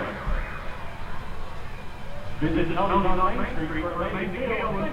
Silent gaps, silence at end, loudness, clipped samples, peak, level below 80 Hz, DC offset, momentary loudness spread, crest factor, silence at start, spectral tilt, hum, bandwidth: none; 0 s; -28 LUFS; under 0.1%; -8 dBFS; -32 dBFS; under 0.1%; 16 LU; 16 dB; 0 s; -7 dB/octave; none; 7.2 kHz